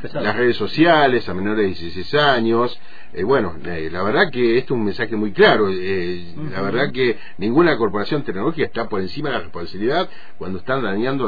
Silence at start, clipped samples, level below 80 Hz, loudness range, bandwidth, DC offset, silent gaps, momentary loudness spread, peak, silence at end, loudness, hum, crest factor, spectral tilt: 0 s; under 0.1%; -50 dBFS; 3 LU; 5 kHz; 5%; none; 13 LU; 0 dBFS; 0 s; -19 LUFS; none; 18 dB; -8 dB/octave